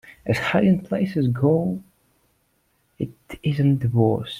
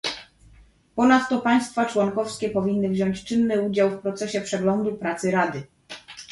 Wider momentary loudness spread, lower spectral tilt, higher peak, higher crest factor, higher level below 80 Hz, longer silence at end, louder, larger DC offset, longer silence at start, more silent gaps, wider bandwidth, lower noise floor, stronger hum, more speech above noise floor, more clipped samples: second, 13 LU vs 16 LU; first, -8 dB/octave vs -5.5 dB/octave; about the same, -6 dBFS vs -6 dBFS; about the same, 18 dB vs 18 dB; about the same, -54 dBFS vs -58 dBFS; about the same, 0 s vs 0 s; about the same, -22 LUFS vs -23 LUFS; neither; about the same, 0.05 s vs 0.05 s; neither; first, 14.5 kHz vs 11.5 kHz; first, -67 dBFS vs -53 dBFS; neither; first, 46 dB vs 31 dB; neither